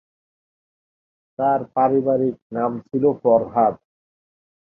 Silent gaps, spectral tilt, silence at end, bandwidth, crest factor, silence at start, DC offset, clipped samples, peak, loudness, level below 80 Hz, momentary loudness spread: 2.42-2.50 s; -11.5 dB/octave; 0.9 s; 3.2 kHz; 18 dB; 1.4 s; under 0.1%; under 0.1%; -4 dBFS; -20 LUFS; -62 dBFS; 8 LU